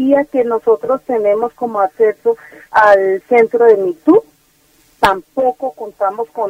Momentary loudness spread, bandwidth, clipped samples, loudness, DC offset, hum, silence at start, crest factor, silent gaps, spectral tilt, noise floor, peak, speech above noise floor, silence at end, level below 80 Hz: 9 LU; 16 kHz; under 0.1%; -14 LUFS; under 0.1%; none; 0 s; 14 dB; none; -5.5 dB/octave; -54 dBFS; 0 dBFS; 40 dB; 0 s; -50 dBFS